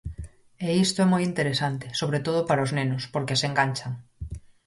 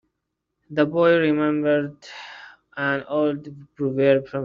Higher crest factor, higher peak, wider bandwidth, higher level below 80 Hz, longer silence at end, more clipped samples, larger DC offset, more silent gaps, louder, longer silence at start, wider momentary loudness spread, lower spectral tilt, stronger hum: about the same, 18 dB vs 18 dB; second, -8 dBFS vs -4 dBFS; first, 11.5 kHz vs 7.2 kHz; first, -48 dBFS vs -64 dBFS; first, 0.3 s vs 0 s; neither; neither; neither; second, -25 LUFS vs -21 LUFS; second, 0.05 s vs 0.7 s; second, 17 LU vs 21 LU; about the same, -5 dB/octave vs -5 dB/octave; neither